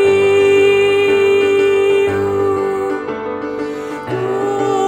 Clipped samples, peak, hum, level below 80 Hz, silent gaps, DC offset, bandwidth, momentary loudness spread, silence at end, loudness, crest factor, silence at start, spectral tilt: under 0.1%; -2 dBFS; none; -54 dBFS; none; under 0.1%; 9.4 kHz; 11 LU; 0 s; -14 LUFS; 12 dB; 0 s; -5 dB/octave